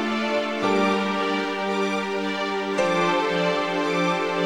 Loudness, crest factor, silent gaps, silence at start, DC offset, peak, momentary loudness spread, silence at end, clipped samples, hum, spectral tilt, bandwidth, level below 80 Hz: -23 LUFS; 14 dB; none; 0 s; under 0.1%; -10 dBFS; 4 LU; 0 s; under 0.1%; none; -5 dB/octave; 16 kHz; -60 dBFS